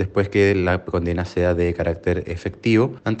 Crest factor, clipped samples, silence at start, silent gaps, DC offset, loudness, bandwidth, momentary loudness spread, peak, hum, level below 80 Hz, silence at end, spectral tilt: 16 dB; under 0.1%; 0 s; none; under 0.1%; -21 LUFS; 8.6 kHz; 6 LU; -6 dBFS; none; -44 dBFS; 0 s; -7.5 dB/octave